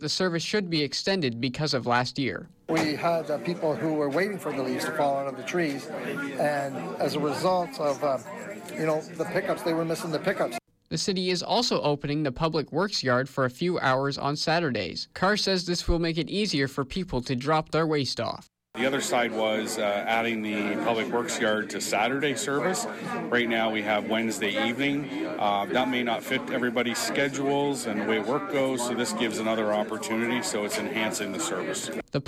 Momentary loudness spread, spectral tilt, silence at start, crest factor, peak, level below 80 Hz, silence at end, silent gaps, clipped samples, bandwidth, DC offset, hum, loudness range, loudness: 5 LU; -4 dB/octave; 0 s; 16 dB; -12 dBFS; -50 dBFS; 0.05 s; none; under 0.1%; 16 kHz; under 0.1%; none; 2 LU; -27 LUFS